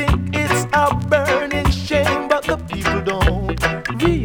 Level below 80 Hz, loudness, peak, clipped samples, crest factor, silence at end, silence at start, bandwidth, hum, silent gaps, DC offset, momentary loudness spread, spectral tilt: -26 dBFS; -18 LUFS; -2 dBFS; under 0.1%; 14 dB; 0 s; 0 s; 19.5 kHz; none; none; under 0.1%; 4 LU; -5.5 dB/octave